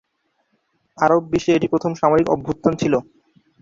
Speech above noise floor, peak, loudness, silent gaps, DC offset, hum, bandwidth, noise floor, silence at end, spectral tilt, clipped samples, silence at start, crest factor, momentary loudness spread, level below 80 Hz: 51 dB; -2 dBFS; -19 LUFS; none; under 0.1%; none; 7.6 kHz; -69 dBFS; 0.6 s; -6.5 dB/octave; under 0.1%; 1 s; 18 dB; 4 LU; -52 dBFS